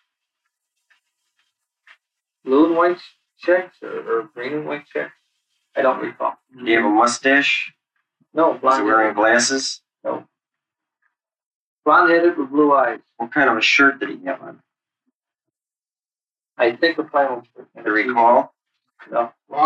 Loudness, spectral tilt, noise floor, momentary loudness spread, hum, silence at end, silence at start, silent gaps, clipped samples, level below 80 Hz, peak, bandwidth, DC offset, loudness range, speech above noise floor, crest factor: -18 LUFS; -3 dB/octave; under -90 dBFS; 14 LU; none; 0 s; 2.45 s; 11.46-11.83 s, 15.15-15.20 s; under 0.1%; -70 dBFS; -2 dBFS; 9.8 kHz; under 0.1%; 7 LU; over 72 dB; 18 dB